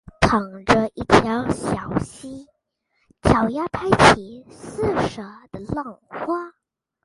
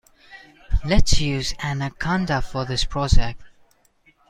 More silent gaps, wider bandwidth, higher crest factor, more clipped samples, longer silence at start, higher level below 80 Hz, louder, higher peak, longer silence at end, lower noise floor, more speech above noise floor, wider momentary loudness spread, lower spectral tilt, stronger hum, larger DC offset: neither; about the same, 11.5 kHz vs 10.5 kHz; about the same, 22 dB vs 18 dB; neither; second, 0.2 s vs 0.35 s; second, -40 dBFS vs -26 dBFS; first, -20 LUFS vs -23 LUFS; about the same, 0 dBFS vs -2 dBFS; second, 0.55 s vs 0.8 s; first, -71 dBFS vs -59 dBFS; first, 51 dB vs 41 dB; about the same, 22 LU vs 21 LU; about the same, -5.5 dB/octave vs -4.5 dB/octave; neither; neither